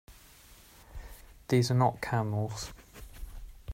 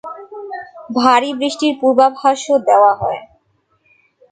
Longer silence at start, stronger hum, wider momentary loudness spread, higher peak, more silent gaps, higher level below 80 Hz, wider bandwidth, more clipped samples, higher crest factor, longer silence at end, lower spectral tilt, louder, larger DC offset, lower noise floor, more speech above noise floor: about the same, 0.1 s vs 0.05 s; neither; first, 24 LU vs 18 LU; second, -12 dBFS vs 0 dBFS; neither; first, -50 dBFS vs -56 dBFS; first, 16 kHz vs 9.4 kHz; neither; about the same, 20 dB vs 16 dB; second, 0 s vs 1.05 s; first, -6 dB/octave vs -4 dB/octave; second, -30 LUFS vs -14 LUFS; neither; second, -56 dBFS vs -61 dBFS; second, 27 dB vs 48 dB